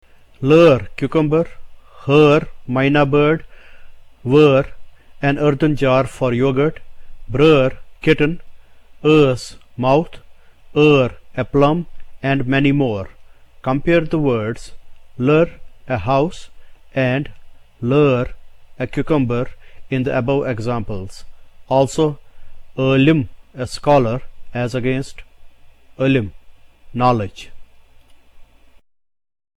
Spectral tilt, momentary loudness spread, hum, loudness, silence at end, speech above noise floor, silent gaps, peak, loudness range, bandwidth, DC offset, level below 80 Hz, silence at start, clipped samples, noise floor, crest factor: -7 dB/octave; 16 LU; none; -17 LUFS; 1.15 s; 29 dB; none; -2 dBFS; 5 LU; 11.5 kHz; under 0.1%; -38 dBFS; 0.4 s; under 0.1%; -45 dBFS; 16 dB